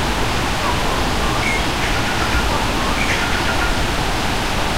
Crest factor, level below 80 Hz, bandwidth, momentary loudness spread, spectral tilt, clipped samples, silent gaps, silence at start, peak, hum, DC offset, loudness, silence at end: 12 dB; -24 dBFS; 16 kHz; 2 LU; -3.5 dB/octave; under 0.1%; none; 0 s; -6 dBFS; none; 4%; -18 LUFS; 0 s